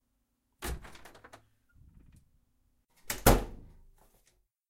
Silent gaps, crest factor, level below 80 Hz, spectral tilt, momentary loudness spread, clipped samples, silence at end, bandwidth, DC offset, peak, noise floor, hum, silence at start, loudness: none; 28 dB; -40 dBFS; -4.5 dB/octave; 27 LU; under 0.1%; 1.1 s; 16 kHz; under 0.1%; -8 dBFS; -78 dBFS; none; 0.6 s; -30 LUFS